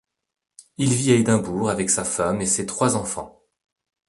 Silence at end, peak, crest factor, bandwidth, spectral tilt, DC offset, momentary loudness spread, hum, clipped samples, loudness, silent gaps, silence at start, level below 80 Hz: 0.8 s; -2 dBFS; 20 dB; 11.5 kHz; -4.5 dB/octave; under 0.1%; 9 LU; none; under 0.1%; -21 LUFS; none; 0.8 s; -52 dBFS